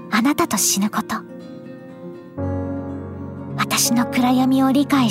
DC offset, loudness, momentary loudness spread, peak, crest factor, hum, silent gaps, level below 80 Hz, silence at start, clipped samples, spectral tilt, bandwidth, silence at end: under 0.1%; -19 LUFS; 20 LU; -4 dBFS; 16 dB; none; none; -54 dBFS; 0 s; under 0.1%; -3.5 dB/octave; 16 kHz; 0 s